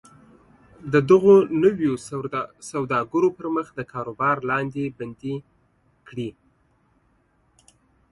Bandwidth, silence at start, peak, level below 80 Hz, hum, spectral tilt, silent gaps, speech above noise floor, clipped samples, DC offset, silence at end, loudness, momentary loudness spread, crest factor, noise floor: 11.5 kHz; 0.85 s; -4 dBFS; -60 dBFS; none; -7 dB/octave; none; 43 dB; under 0.1%; under 0.1%; 1.8 s; -22 LUFS; 18 LU; 20 dB; -64 dBFS